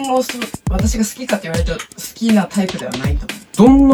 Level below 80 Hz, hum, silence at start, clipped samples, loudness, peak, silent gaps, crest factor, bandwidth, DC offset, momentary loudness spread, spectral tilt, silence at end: -26 dBFS; none; 0 s; under 0.1%; -17 LUFS; 0 dBFS; none; 16 dB; 19.5 kHz; under 0.1%; 12 LU; -5.5 dB/octave; 0 s